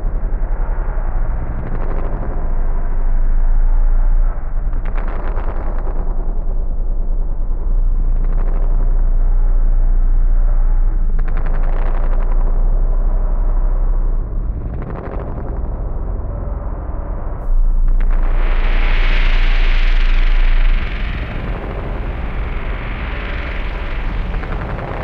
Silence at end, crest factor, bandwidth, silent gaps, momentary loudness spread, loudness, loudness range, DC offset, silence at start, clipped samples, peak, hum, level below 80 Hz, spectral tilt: 0 s; 10 dB; 4.5 kHz; none; 6 LU; -22 LUFS; 5 LU; under 0.1%; 0 s; under 0.1%; -4 dBFS; none; -14 dBFS; -8 dB/octave